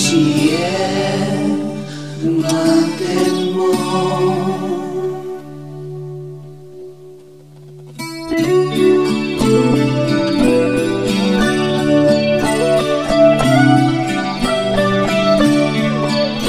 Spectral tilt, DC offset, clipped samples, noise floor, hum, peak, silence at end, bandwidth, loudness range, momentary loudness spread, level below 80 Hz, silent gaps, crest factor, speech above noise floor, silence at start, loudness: -5.5 dB/octave; 0.7%; under 0.1%; -39 dBFS; none; 0 dBFS; 0 s; 15.5 kHz; 10 LU; 16 LU; -40 dBFS; none; 16 dB; 25 dB; 0 s; -15 LUFS